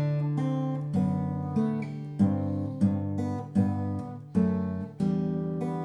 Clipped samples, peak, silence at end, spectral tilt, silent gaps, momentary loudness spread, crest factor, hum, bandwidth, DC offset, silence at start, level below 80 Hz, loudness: under 0.1%; -12 dBFS; 0 s; -10 dB/octave; none; 5 LU; 16 dB; none; 9.2 kHz; under 0.1%; 0 s; -62 dBFS; -29 LUFS